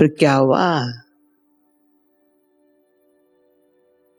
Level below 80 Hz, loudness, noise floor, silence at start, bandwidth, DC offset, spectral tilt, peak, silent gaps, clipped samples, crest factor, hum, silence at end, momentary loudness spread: -70 dBFS; -17 LUFS; -62 dBFS; 0 s; 18.5 kHz; under 0.1%; -6.5 dB/octave; 0 dBFS; none; under 0.1%; 22 dB; none; 3.2 s; 15 LU